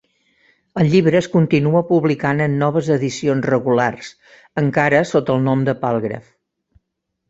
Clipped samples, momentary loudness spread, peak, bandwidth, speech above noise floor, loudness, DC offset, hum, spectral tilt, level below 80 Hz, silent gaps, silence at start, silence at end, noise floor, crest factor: under 0.1%; 10 LU; -2 dBFS; 8 kHz; 59 dB; -17 LUFS; under 0.1%; none; -7 dB/octave; -54 dBFS; none; 0.75 s; 1.1 s; -76 dBFS; 16 dB